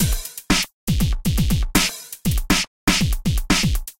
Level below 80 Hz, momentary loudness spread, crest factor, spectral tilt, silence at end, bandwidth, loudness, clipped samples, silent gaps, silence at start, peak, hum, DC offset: -24 dBFS; 5 LU; 18 dB; -3.5 dB/octave; 0.1 s; 17 kHz; -21 LUFS; under 0.1%; 0.73-0.87 s, 2.67-2.87 s; 0 s; -2 dBFS; none; under 0.1%